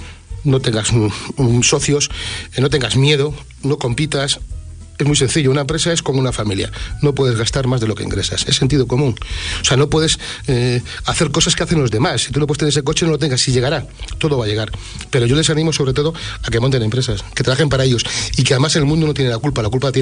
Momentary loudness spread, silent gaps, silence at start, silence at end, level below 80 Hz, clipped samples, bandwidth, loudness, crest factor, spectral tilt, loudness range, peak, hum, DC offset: 8 LU; none; 0 s; 0 s; -32 dBFS; under 0.1%; 10 kHz; -16 LUFS; 14 dB; -4.5 dB/octave; 2 LU; -2 dBFS; none; under 0.1%